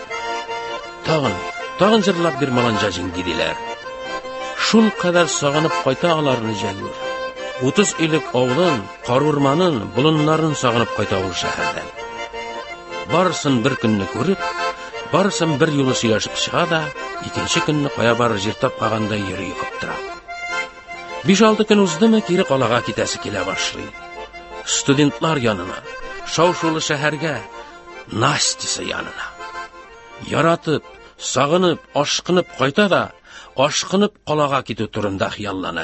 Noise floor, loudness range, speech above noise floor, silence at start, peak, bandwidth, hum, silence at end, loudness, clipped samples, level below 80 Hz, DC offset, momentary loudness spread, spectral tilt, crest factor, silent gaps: -40 dBFS; 4 LU; 22 dB; 0 s; 0 dBFS; 8.6 kHz; none; 0 s; -19 LUFS; under 0.1%; -48 dBFS; under 0.1%; 14 LU; -4.5 dB/octave; 18 dB; none